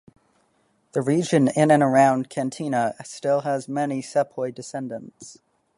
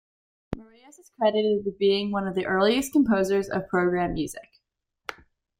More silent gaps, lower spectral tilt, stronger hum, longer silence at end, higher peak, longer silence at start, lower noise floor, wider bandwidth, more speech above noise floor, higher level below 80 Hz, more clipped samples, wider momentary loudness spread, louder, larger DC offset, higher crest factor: neither; about the same, -6 dB/octave vs -5.5 dB/octave; neither; about the same, 0.45 s vs 0.45 s; first, -4 dBFS vs -8 dBFS; first, 0.95 s vs 0.5 s; second, -66 dBFS vs -78 dBFS; second, 11.5 kHz vs 16.5 kHz; second, 44 dB vs 54 dB; second, -68 dBFS vs -52 dBFS; neither; second, 15 LU vs 18 LU; about the same, -22 LUFS vs -24 LUFS; neither; about the same, 20 dB vs 18 dB